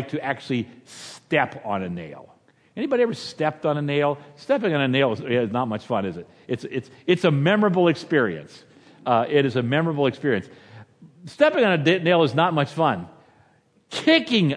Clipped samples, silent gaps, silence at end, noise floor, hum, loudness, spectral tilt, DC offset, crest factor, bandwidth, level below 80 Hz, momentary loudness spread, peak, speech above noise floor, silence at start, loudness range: under 0.1%; none; 0 s; -60 dBFS; none; -22 LUFS; -6.5 dB/octave; under 0.1%; 20 dB; 11 kHz; -68 dBFS; 14 LU; -4 dBFS; 38 dB; 0 s; 4 LU